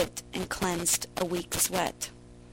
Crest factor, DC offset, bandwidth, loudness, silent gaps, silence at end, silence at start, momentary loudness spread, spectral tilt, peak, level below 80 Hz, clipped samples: 20 dB; under 0.1%; 16.5 kHz; -29 LUFS; none; 0 s; 0 s; 10 LU; -2.5 dB/octave; -12 dBFS; -52 dBFS; under 0.1%